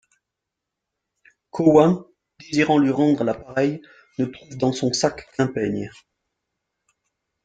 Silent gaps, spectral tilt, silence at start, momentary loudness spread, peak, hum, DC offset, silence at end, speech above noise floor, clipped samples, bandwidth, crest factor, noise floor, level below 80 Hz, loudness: none; -6 dB/octave; 1.55 s; 13 LU; -2 dBFS; none; under 0.1%; 1.55 s; 63 dB; under 0.1%; 9.2 kHz; 20 dB; -84 dBFS; -58 dBFS; -21 LUFS